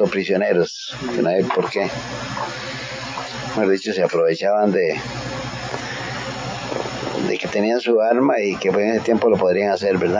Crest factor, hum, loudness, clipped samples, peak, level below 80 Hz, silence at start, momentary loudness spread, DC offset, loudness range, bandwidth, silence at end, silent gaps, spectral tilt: 16 dB; none; -20 LUFS; under 0.1%; -4 dBFS; -50 dBFS; 0 s; 10 LU; under 0.1%; 4 LU; 7.6 kHz; 0 s; none; -5.5 dB/octave